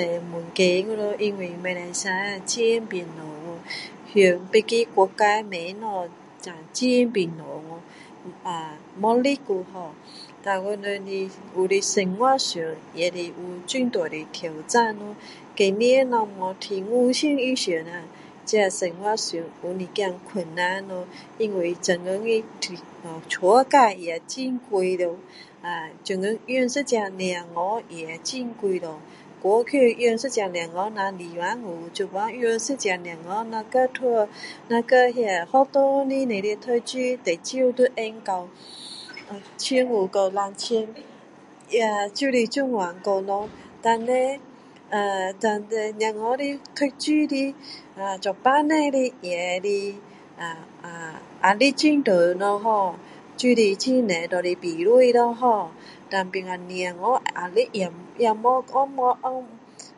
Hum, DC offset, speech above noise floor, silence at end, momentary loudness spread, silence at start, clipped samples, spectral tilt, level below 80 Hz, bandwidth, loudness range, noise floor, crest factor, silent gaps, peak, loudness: none; under 0.1%; 25 dB; 0.1 s; 17 LU; 0 s; under 0.1%; -4 dB/octave; -74 dBFS; 11.5 kHz; 5 LU; -48 dBFS; 22 dB; none; -2 dBFS; -23 LUFS